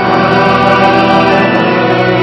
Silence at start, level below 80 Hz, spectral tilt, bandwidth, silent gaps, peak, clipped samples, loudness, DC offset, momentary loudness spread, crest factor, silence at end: 0 s; -42 dBFS; -6.5 dB/octave; 10.5 kHz; none; 0 dBFS; 1%; -8 LUFS; under 0.1%; 2 LU; 8 dB; 0 s